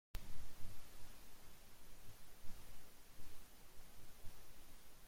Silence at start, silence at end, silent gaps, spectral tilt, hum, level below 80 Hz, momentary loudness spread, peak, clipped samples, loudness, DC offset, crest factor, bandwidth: 0.15 s; 0 s; none; -3.5 dB/octave; none; -58 dBFS; 4 LU; -30 dBFS; under 0.1%; -62 LUFS; under 0.1%; 14 dB; 16.5 kHz